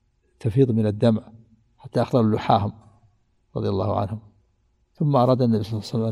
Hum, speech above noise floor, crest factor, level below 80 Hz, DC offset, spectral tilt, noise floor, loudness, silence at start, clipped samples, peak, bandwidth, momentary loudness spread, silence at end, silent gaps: none; 44 dB; 20 dB; -56 dBFS; under 0.1%; -8.5 dB/octave; -65 dBFS; -22 LUFS; 0.45 s; under 0.1%; -4 dBFS; 11.5 kHz; 11 LU; 0 s; none